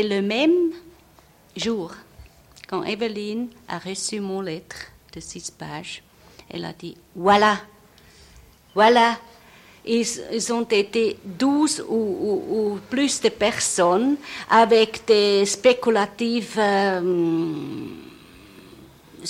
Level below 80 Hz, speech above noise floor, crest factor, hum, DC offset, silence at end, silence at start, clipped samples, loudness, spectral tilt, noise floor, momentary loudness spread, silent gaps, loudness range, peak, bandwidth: -58 dBFS; 32 dB; 18 dB; none; under 0.1%; 0 s; 0 s; under 0.1%; -21 LUFS; -3.5 dB/octave; -53 dBFS; 18 LU; none; 11 LU; -4 dBFS; 16 kHz